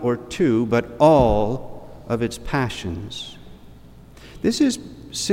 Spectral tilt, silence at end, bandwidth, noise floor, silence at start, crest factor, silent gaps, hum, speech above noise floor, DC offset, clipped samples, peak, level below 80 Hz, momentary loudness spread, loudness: -5.5 dB/octave; 0 s; 16.5 kHz; -44 dBFS; 0 s; 20 dB; none; none; 24 dB; under 0.1%; under 0.1%; -2 dBFS; -38 dBFS; 17 LU; -21 LUFS